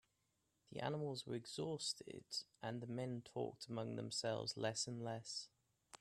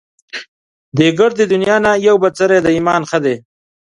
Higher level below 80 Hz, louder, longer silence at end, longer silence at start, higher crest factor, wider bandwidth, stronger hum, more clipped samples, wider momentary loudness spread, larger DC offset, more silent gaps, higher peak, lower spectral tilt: second, -82 dBFS vs -50 dBFS; second, -46 LUFS vs -13 LUFS; second, 0.05 s vs 0.6 s; first, 0.7 s vs 0.35 s; first, 20 dB vs 14 dB; first, 14 kHz vs 11 kHz; neither; neither; second, 7 LU vs 17 LU; neither; second, none vs 0.48-0.92 s; second, -28 dBFS vs 0 dBFS; second, -4 dB/octave vs -5.5 dB/octave